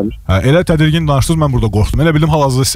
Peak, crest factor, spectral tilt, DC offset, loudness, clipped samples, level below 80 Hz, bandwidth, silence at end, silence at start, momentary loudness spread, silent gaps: -2 dBFS; 8 dB; -6 dB/octave; 0.3%; -12 LUFS; under 0.1%; -24 dBFS; 16 kHz; 0 s; 0 s; 3 LU; none